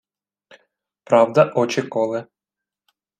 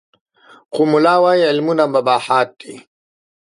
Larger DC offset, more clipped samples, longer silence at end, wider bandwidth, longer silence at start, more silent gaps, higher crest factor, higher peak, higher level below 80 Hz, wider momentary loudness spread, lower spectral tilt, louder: neither; neither; first, 0.95 s vs 0.8 s; second, 9.4 kHz vs 11.5 kHz; first, 1.1 s vs 0.7 s; neither; about the same, 20 dB vs 16 dB; about the same, -2 dBFS vs 0 dBFS; about the same, -70 dBFS vs -72 dBFS; second, 9 LU vs 14 LU; about the same, -6 dB/octave vs -5.5 dB/octave; second, -19 LUFS vs -15 LUFS